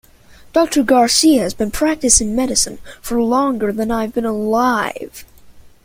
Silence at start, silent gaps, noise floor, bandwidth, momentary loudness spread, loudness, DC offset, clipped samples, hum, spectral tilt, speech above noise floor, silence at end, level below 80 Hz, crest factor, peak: 0.55 s; none; -44 dBFS; 16.5 kHz; 9 LU; -15 LUFS; under 0.1%; under 0.1%; none; -2.5 dB/octave; 28 dB; 0.15 s; -38 dBFS; 16 dB; 0 dBFS